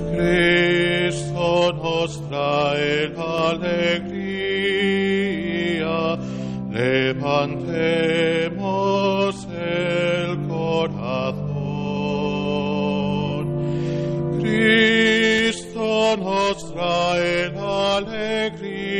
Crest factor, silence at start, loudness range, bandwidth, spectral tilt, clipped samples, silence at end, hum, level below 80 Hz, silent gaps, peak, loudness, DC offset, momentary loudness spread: 14 dB; 0 s; 5 LU; 11 kHz; -5.5 dB/octave; under 0.1%; 0 s; none; -46 dBFS; none; -6 dBFS; -21 LUFS; under 0.1%; 9 LU